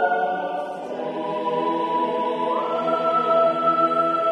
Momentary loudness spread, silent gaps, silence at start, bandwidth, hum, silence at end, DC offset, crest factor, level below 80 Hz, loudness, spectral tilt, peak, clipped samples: 9 LU; none; 0 s; 10 kHz; none; 0 s; under 0.1%; 14 dB; -70 dBFS; -22 LUFS; -6 dB/octave; -8 dBFS; under 0.1%